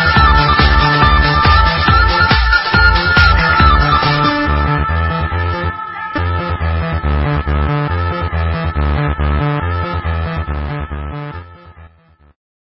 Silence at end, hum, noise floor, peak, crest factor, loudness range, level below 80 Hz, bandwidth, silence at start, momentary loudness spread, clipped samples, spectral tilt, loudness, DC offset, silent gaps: 0.9 s; none; -48 dBFS; 0 dBFS; 14 dB; 9 LU; -18 dBFS; 5.8 kHz; 0 s; 11 LU; under 0.1%; -8 dB/octave; -13 LUFS; under 0.1%; none